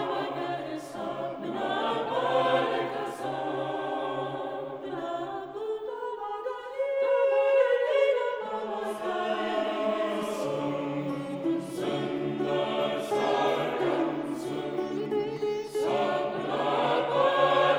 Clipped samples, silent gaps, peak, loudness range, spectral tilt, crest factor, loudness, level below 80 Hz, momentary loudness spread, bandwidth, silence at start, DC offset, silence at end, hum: under 0.1%; none; -12 dBFS; 6 LU; -5.5 dB/octave; 18 dB; -29 LUFS; -70 dBFS; 10 LU; over 20 kHz; 0 s; under 0.1%; 0 s; none